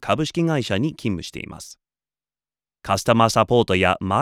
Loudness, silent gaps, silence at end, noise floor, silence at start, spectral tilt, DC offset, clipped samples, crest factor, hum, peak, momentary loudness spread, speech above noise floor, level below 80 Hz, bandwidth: -20 LUFS; none; 0 s; under -90 dBFS; 0 s; -5.5 dB/octave; under 0.1%; under 0.1%; 20 dB; none; -2 dBFS; 19 LU; over 70 dB; -50 dBFS; 16 kHz